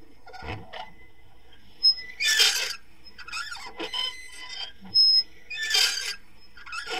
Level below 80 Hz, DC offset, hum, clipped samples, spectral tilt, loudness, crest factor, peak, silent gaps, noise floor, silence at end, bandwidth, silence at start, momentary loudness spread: -58 dBFS; 0.7%; none; under 0.1%; 1 dB/octave; -22 LUFS; 20 dB; -8 dBFS; none; -54 dBFS; 0 s; 16 kHz; 0.25 s; 21 LU